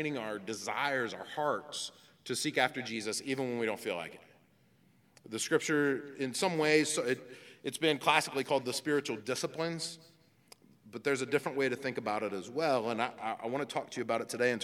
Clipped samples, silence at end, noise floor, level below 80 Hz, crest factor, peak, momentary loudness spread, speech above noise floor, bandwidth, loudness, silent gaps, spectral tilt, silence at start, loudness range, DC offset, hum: under 0.1%; 0 s; -67 dBFS; -86 dBFS; 24 dB; -10 dBFS; 11 LU; 33 dB; 16.5 kHz; -33 LUFS; none; -3.5 dB/octave; 0 s; 5 LU; under 0.1%; none